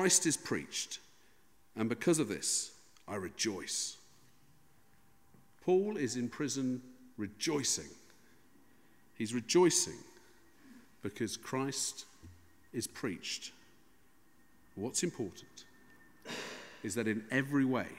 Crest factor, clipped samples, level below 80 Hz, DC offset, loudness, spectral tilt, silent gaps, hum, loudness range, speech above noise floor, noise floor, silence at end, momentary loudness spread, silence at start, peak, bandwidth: 24 dB; under 0.1%; -74 dBFS; under 0.1%; -35 LUFS; -3 dB/octave; none; none; 7 LU; 35 dB; -69 dBFS; 0 s; 18 LU; 0 s; -14 dBFS; 16 kHz